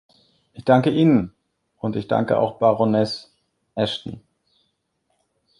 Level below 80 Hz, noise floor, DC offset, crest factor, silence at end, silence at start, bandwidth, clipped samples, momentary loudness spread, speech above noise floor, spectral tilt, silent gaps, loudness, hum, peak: -56 dBFS; -72 dBFS; under 0.1%; 20 dB; 1.4 s; 0.55 s; 11 kHz; under 0.1%; 17 LU; 52 dB; -7.5 dB/octave; none; -20 LUFS; none; -2 dBFS